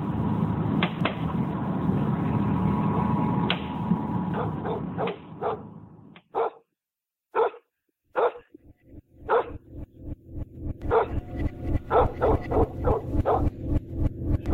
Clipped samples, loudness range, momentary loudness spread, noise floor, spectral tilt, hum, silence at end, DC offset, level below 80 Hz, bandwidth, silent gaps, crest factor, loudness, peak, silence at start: under 0.1%; 6 LU; 13 LU; -89 dBFS; -9.5 dB/octave; none; 0 s; under 0.1%; -36 dBFS; 4.9 kHz; none; 20 dB; -27 LUFS; -8 dBFS; 0 s